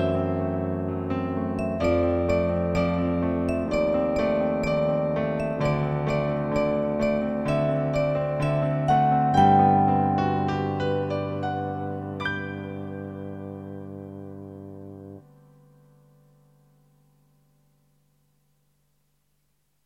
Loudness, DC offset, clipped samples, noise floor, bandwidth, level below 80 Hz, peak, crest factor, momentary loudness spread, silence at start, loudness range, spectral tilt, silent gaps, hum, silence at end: -25 LUFS; under 0.1%; under 0.1%; -72 dBFS; 8.8 kHz; -46 dBFS; -6 dBFS; 20 dB; 17 LU; 0 s; 17 LU; -8 dB/octave; none; none; 4.65 s